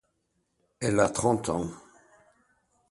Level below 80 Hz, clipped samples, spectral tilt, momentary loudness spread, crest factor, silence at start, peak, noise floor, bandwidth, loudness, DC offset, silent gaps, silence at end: -56 dBFS; under 0.1%; -5 dB/octave; 9 LU; 22 dB; 0.8 s; -10 dBFS; -76 dBFS; 12 kHz; -27 LUFS; under 0.1%; none; 1.1 s